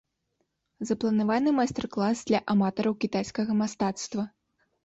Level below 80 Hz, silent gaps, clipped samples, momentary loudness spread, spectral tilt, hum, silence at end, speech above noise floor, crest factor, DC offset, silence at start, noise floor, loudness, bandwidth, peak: -62 dBFS; none; under 0.1%; 8 LU; -5.5 dB/octave; none; 0.55 s; 51 dB; 16 dB; under 0.1%; 0.8 s; -77 dBFS; -27 LUFS; 8 kHz; -12 dBFS